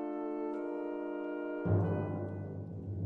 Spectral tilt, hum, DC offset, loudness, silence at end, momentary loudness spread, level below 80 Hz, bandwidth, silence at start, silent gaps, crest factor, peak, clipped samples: -11.5 dB/octave; none; under 0.1%; -37 LUFS; 0 s; 10 LU; -64 dBFS; 3.3 kHz; 0 s; none; 18 dB; -18 dBFS; under 0.1%